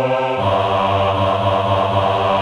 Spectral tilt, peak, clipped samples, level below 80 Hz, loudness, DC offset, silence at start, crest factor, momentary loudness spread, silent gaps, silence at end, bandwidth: -6.5 dB/octave; -2 dBFS; under 0.1%; -46 dBFS; -17 LUFS; under 0.1%; 0 s; 14 dB; 1 LU; none; 0 s; 11 kHz